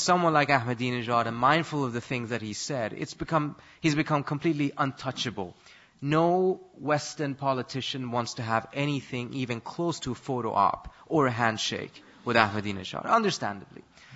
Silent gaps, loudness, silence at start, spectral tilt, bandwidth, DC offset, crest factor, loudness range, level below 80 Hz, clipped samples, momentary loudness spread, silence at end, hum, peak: none; -28 LUFS; 0 s; -5 dB/octave; 8 kHz; under 0.1%; 24 dB; 3 LU; -60 dBFS; under 0.1%; 10 LU; 0 s; none; -4 dBFS